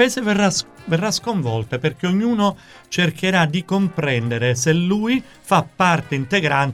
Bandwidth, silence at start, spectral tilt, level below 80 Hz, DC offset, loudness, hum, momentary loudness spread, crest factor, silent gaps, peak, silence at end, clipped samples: 15 kHz; 0 s; -5 dB/octave; -54 dBFS; under 0.1%; -19 LUFS; none; 6 LU; 16 dB; none; -2 dBFS; 0 s; under 0.1%